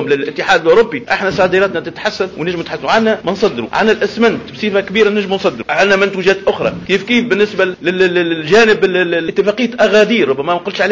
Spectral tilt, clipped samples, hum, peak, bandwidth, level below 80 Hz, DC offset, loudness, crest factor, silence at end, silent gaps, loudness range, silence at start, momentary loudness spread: -5 dB/octave; under 0.1%; none; 0 dBFS; 7.6 kHz; -48 dBFS; 0.2%; -13 LUFS; 12 dB; 0 s; none; 3 LU; 0 s; 8 LU